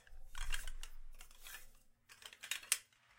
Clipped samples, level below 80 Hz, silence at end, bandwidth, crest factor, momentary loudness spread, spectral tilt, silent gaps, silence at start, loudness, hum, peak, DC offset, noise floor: under 0.1%; -48 dBFS; 0.35 s; 16.5 kHz; 32 dB; 20 LU; 1 dB/octave; none; 0.05 s; -44 LUFS; none; -12 dBFS; under 0.1%; -65 dBFS